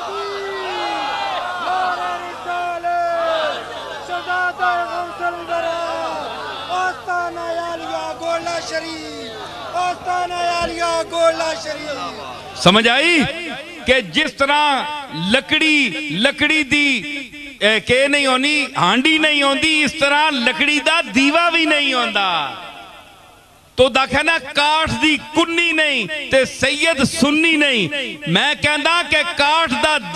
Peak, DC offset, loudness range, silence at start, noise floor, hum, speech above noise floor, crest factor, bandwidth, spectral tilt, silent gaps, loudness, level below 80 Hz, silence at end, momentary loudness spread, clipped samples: 0 dBFS; under 0.1%; 9 LU; 0 s; -47 dBFS; none; 30 dB; 18 dB; 14 kHz; -3 dB/octave; none; -16 LUFS; -48 dBFS; 0 s; 12 LU; under 0.1%